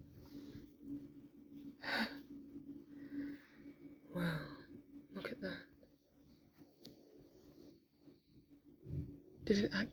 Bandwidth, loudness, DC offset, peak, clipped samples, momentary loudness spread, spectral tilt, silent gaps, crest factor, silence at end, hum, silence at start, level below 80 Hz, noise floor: over 20 kHz; -45 LUFS; under 0.1%; -20 dBFS; under 0.1%; 24 LU; -6 dB/octave; none; 26 dB; 0 s; none; 0 s; -68 dBFS; -68 dBFS